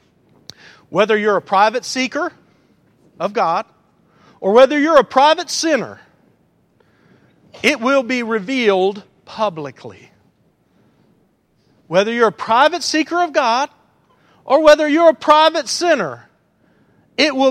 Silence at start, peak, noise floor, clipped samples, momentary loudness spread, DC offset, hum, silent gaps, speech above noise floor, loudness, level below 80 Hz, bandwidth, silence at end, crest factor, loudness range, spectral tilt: 0.9 s; 0 dBFS; -59 dBFS; under 0.1%; 14 LU; under 0.1%; none; none; 44 dB; -15 LUFS; -58 dBFS; 14 kHz; 0 s; 18 dB; 7 LU; -3.5 dB/octave